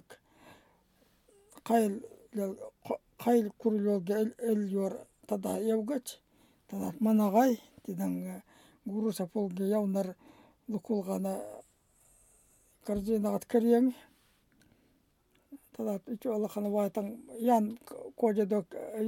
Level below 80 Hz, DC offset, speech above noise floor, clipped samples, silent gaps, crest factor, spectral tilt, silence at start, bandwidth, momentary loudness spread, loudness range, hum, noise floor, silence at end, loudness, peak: -68 dBFS; under 0.1%; 40 dB; under 0.1%; none; 20 dB; -7 dB/octave; 0.1 s; 17.5 kHz; 17 LU; 5 LU; none; -71 dBFS; 0 s; -32 LUFS; -14 dBFS